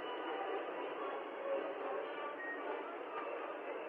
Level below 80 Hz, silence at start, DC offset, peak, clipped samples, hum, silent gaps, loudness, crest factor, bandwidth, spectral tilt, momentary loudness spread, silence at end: under -90 dBFS; 0 s; under 0.1%; -28 dBFS; under 0.1%; none; none; -43 LUFS; 14 dB; 5.2 kHz; -5.5 dB/octave; 3 LU; 0 s